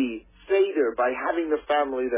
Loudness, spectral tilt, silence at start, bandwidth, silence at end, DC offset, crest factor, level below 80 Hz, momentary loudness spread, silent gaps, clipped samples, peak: -25 LUFS; -8 dB/octave; 0 s; 3.8 kHz; 0 s; under 0.1%; 14 dB; -58 dBFS; 5 LU; none; under 0.1%; -12 dBFS